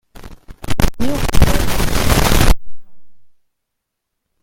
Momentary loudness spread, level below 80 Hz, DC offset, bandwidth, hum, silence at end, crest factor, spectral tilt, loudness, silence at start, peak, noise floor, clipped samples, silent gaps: 9 LU; -20 dBFS; under 0.1%; 17 kHz; none; 1.2 s; 14 dB; -4.5 dB/octave; -17 LUFS; 0.25 s; 0 dBFS; -76 dBFS; 0.3%; none